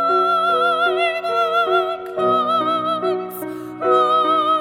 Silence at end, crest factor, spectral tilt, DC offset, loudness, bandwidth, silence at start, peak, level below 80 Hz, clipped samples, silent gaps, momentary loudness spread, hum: 0 s; 14 dB; -4.5 dB/octave; under 0.1%; -18 LUFS; 19.5 kHz; 0 s; -4 dBFS; -64 dBFS; under 0.1%; none; 8 LU; none